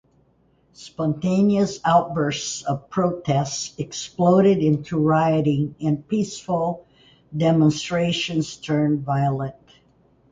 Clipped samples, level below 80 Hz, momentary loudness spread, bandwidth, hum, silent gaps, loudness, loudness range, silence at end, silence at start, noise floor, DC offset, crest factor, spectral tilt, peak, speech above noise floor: under 0.1%; -56 dBFS; 10 LU; 9.4 kHz; none; none; -21 LUFS; 2 LU; 0.8 s; 0.8 s; -61 dBFS; under 0.1%; 16 dB; -6 dB/octave; -6 dBFS; 40 dB